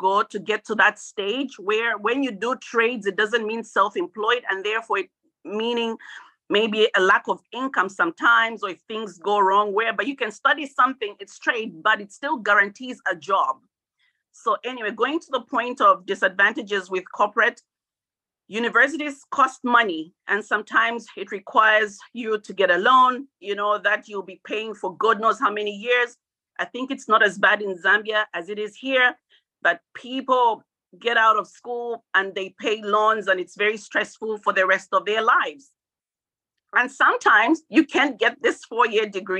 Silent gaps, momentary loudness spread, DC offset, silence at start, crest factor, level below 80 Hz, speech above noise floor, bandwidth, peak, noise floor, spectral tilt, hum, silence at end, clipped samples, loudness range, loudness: none; 12 LU; under 0.1%; 0 s; 20 dB; -78 dBFS; over 68 dB; 10 kHz; -4 dBFS; under -90 dBFS; -3 dB/octave; none; 0 s; under 0.1%; 3 LU; -21 LUFS